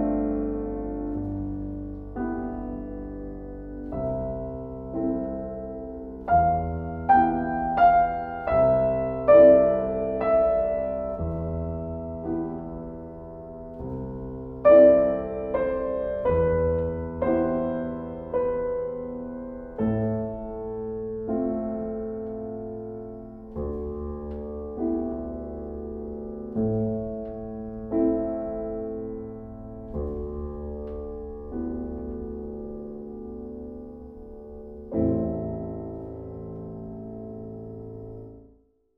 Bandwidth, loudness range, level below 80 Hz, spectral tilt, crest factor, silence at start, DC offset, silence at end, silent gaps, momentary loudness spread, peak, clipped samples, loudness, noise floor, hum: 4.3 kHz; 14 LU; -42 dBFS; -11.5 dB/octave; 20 dB; 0 s; under 0.1%; 0.55 s; none; 17 LU; -6 dBFS; under 0.1%; -26 LUFS; -60 dBFS; none